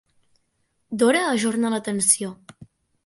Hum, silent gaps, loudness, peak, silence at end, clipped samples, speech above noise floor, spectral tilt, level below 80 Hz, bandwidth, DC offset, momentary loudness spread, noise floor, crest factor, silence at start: none; none; -20 LUFS; -2 dBFS; 0.4 s; under 0.1%; 49 dB; -3 dB/octave; -66 dBFS; 12 kHz; under 0.1%; 10 LU; -71 dBFS; 22 dB; 0.9 s